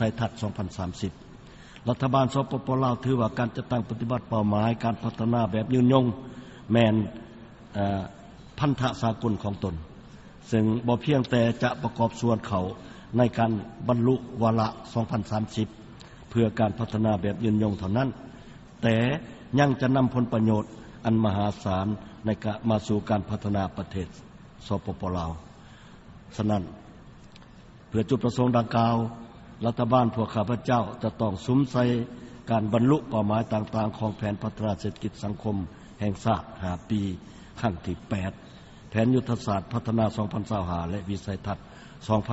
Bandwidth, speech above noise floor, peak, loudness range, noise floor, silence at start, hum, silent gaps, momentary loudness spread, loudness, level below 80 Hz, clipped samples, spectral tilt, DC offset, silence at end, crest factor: 8 kHz; 24 dB; -6 dBFS; 5 LU; -49 dBFS; 0 s; none; none; 14 LU; -27 LUFS; -50 dBFS; under 0.1%; -7 dB/octave; under 0.1%; 0 s; 20 dB